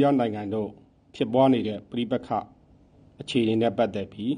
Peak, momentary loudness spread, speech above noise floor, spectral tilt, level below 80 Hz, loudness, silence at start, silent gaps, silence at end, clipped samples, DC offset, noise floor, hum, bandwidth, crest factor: -8 dBFS; 10 LU; 31 dB; -7.5 dB/octave; -62 dBFS; -26 LUFS; 0 s; none; 0 s; under 0.1%; under 0.1%; -56 dBFS; none; 10 kHz; 18 dB